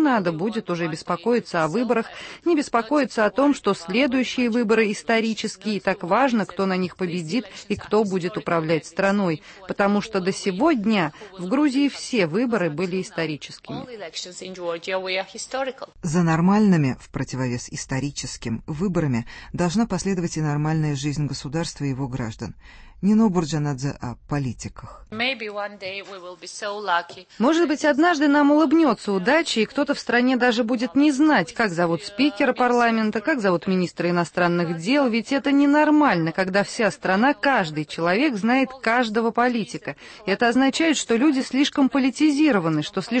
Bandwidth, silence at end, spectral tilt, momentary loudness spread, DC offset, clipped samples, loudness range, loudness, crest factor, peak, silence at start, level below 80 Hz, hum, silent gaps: 8.8 kHz; 0 s; -5.5 dB/octave; 12 LU; under 0.1%; under 0.1%; 6 LU; -22 LUFS; 14 dB; -6 dBFS; 0 s; -52 dBFS; none; none